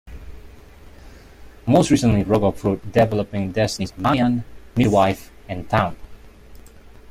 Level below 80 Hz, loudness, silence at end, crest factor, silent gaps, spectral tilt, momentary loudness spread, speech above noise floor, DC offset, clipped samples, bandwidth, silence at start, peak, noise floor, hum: -42 dBFS; -20 LUFS; 0.25 s; 18 dB; none; -6.5 dB/octave; 15 LU; 24 dB; under 0.1%; under 0.1%; 15.5 kHz; 0.05 s; -4 dBFS; -43 dBFS; none